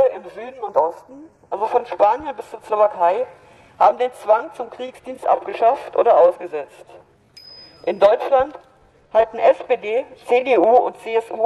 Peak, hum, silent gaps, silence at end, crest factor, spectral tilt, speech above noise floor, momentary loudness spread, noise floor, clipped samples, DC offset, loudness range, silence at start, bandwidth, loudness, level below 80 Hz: -4 dBFS; none; none; 0 s; 16 dB; -5 dB/octave; 28 dB; 16 LU; -46 dBFS; under 0.1%; under 0.1%; 2 LU; 0 s; 11.5 kHz; -18 LUFS; -60 dBFS